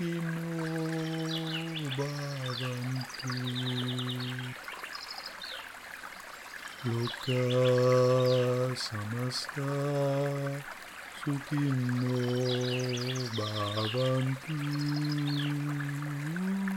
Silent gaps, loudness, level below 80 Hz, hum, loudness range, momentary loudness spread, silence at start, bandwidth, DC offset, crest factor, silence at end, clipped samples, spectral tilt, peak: none; -32 LUFS; -68 dBFS; none; 8 LU; 13 LU; 0 s; 16.5 kHz; under 0.1%; 16 dB; 0 s; under 0.1%; -6 dB/octave; -16 dBFS